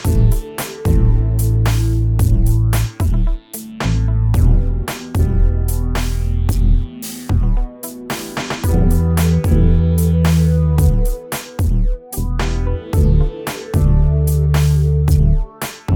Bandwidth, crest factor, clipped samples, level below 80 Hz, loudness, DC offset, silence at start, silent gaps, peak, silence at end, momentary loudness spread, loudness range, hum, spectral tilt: 20 kHz; 12 dB; under 0.1%; -18 dBFS; -17 LUFS; under 0.1%; 0 s; none; -2 dBFS; 0 s; 9 LU; 4 LU; none; -6.5 dB/octave